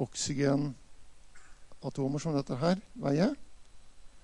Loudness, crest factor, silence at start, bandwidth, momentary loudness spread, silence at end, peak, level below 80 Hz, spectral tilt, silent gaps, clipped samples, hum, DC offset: -32 LUFS; 18 dB; 0 s; 11 kHz; 13 LU; 0.05 s; -14 dBFS; -58 dBFS; -5.5 dB/octave; none; under 0.1%; none; under 0.1%